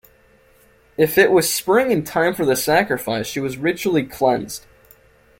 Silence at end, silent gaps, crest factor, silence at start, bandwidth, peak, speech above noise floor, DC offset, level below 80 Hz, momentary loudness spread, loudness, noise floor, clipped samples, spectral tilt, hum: 0.8 s; none; 18 dB; 1 s; 17 kHz; -2 dBFS; 35 dB; under 0.1%; -54 dBFS; 10 LU; -18 LUFS; -54 dBFS; under 0.1%; -4 dB/octave; none